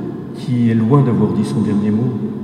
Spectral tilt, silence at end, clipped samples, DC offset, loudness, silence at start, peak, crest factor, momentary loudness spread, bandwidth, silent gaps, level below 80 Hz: -9 dB/octave; 0 s; under 0.1%; under 0.1%; -16 LUFS; 0 s; 0 dBFS; 14 dB; 8 LU; 10.5 kHz; none; -54 dBFS